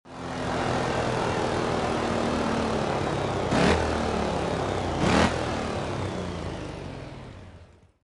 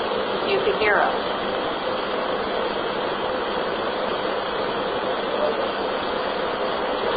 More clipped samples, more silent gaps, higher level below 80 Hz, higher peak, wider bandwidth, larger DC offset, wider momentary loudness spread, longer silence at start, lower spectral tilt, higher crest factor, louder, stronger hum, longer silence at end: neither; neither; first, -42 dBFS vs -52 dBFS; about the same, -8 dBFS vs -6 dBFS; first, 11.5 kHz vs 5 kHz; neither; first, 14 LU vs 5 LU; about the same, 0.05 s vs 0 s; second, -5.5 dB/octave vs -8.5 dB/octave; about the same, 20 dB vs 18 dB; second, -27 LUFS vs -24 LUFS; neither; first, 0.4 s vs 0 s